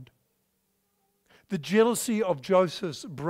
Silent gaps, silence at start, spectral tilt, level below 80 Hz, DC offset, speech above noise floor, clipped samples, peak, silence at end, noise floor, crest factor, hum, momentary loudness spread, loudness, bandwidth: none; 0 s; -5 dB/octave; -70 dBFS; under 0.1%; 49 dB; under 0.1%; -10 dBFS; 0 s; -74 dBFS; 18 dB; none; 12 LU; -26 LUFS; 16 kHz